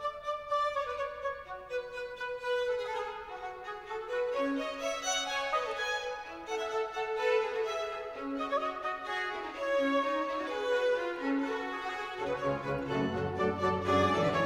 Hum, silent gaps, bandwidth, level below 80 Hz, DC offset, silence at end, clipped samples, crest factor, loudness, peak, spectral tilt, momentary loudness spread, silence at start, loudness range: none; none; 16 kHz; -62 dBFS; under 0.1%; 0 s; under 0.1%; 18 dB; -33 LUFS; -16 dBFS; -4 dB/octave; 9 LU; 0 s; 3 LU